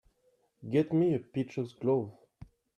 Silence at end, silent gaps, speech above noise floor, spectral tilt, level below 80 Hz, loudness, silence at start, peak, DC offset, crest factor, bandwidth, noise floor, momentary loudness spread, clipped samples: 0.35 s; none; 42 dB; -9 dB/octave; -66 dBFS; -31 LUFS; 0.6 s; -16 dBFS; under 0.1%; 16 dB; 9.4 kHz; -72 dBFS; 11 LU; under 0.1%